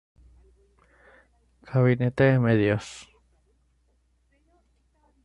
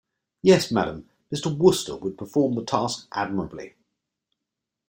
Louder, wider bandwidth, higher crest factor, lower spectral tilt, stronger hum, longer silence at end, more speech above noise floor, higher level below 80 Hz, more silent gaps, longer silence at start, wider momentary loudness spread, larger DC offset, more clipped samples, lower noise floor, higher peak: about the same, -23 LUFS vs -24 LUFS; second, 10.5 kHz vs 16.5 kHz; about the same, 20 dB vs 22 dB; first, -8 dB/octave vs -5.5 dB/octave; neither; first, 2.2 s vs 1.2 s; second, 45 dB vs 62 dB; about the same, -56 dBFS vs -58 dBFS; neither; first, 1.7 s vs 0.45 s; about the same, 15 LU vs 16 LU; neither; neither; second, -67 dBFS vs -85 dBFS; second, -8 dBFS vs -2 dBFS